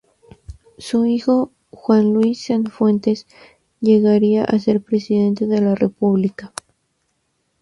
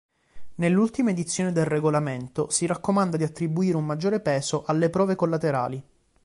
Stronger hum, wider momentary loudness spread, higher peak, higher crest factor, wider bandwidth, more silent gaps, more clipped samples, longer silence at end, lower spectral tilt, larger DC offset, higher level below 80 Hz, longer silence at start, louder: neither; first, 12 LU vs 5 LU; first, -2 dBFS vs -10 dBFS; about the same, 16 dB vs 14 dB; about the same, 11.5 kHz vs 11.5 kHz; neither; neither; first, 1.15 s vs 0.45 s; first, -7.5 dB/octave vs -6 dB/octave; neither; first, -52 dBFS vs -60 dBFS; first, 0.5 s vs 0.35 s; first, -17 LUFS vs -25 LUFS